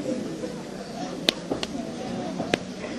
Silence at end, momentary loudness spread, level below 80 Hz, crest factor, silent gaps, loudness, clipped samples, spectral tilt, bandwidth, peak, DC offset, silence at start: 0 s; 9 LU; -56 dBFS; 30 dB; none; -30 LUFS; under 0.1%; -4 dB/octave; 15 kHz; 0 dBFS; under 0.1%; 0 s